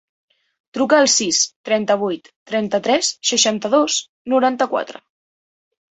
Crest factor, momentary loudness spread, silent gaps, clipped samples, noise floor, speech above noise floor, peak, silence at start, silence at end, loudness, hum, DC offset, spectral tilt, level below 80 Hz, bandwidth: 18 dB; 11 LU; 1.56-1.64 s, 2.36-2.46 s, 4.09-4.25 s; under 0.1%; under -90 dBFS; over 72 dB; -2 dBFS; 0.75 s; 1 s; -17 LUFS; none; under 0.1%; -2 dB/octave; -66 dBFS; 8.4 kHz